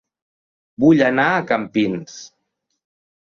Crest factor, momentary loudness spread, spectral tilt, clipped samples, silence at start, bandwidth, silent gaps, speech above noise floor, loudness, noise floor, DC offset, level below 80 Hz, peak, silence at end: 18 dB; 18 LU; -6 dB/octave; under 0.1%; 0.8 s; 7.2 kHz; none; 57 dB; -17 LUFS; -74 dBFS; under 0.1%; -58 dBFS; -2 dBFS; 0.95 s